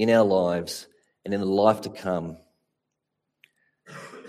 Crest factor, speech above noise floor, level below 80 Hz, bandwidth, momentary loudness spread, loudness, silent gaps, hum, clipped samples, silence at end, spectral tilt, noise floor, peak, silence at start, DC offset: 22 dB; 59 dB; -66 dBFS; 15 kHz; 22 LU; -24 LUFS; none; none; under 0.1%; 0 s; -6 dB/octave; -82 dBFS; -4 dBFS; 0 s; under 0.1%